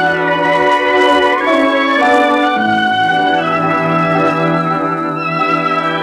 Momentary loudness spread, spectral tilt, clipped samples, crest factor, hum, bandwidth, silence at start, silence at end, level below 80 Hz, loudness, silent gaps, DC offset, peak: 4 LU; -5.5 dB/octave; under 0.1%; 12 dB; none; 13 kHz; 0 s; 0 s; -52 dBFS; -12 LUFS; none; under 0.1%; 0 dBFS